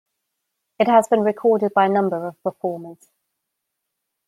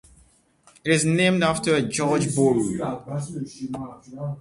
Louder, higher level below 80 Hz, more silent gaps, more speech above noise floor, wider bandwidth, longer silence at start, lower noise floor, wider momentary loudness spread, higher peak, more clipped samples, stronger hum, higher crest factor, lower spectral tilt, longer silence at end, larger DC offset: first, -19 LUFS vs -23 LUFS; second, -72 dBFS vs -56 dBFS; neither; first, 60 dB vs 35 dB; first, 13 kHz vs 11.5 kHz; about the same, 0.8 s vs 0.85 s; first, -79 dBFS vs -58 dBFS; about the same, 12 LU vs 14 LU; first, -2 dBFS vs -6 dBFS; neither; neither; about the same, 20 dB vs 18 dB; about the same, -6 dB/octave vs -5 dB/octave; first, 1.35 s vs 0 s; neither